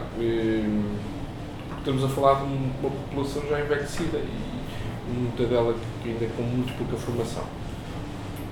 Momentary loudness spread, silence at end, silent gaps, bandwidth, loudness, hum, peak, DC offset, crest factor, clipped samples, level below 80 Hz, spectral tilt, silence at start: 12 LU; 0 s; none; 18.5 kHz; -28 LUFS; none; -6 dBFS; under 0.1%; 22 dB; under 0.1%; -40 dBFS; -7 dB/octave; 0 s